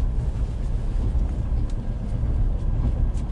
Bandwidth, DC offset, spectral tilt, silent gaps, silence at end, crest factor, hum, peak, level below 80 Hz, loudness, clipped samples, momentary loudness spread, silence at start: 5.2 kHz; under 0.1%; -8.5 dB/octave; none; 0 s; 12 dB; none; -12 dBFS; -24 dBFS; -27 LUFS; under 0.1%; 3 LU; 0 s